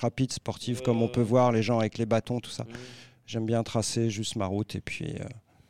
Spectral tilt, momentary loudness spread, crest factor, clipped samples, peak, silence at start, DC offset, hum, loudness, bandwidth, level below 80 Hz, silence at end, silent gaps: -5.5 dB/octave; 15 LU; 18 dB; under 0.1%; -10 dBFS; 0 s; 0.2%; none; -29 LUFS; 13.5 kHz; -58 dBFS; 0.3 s; none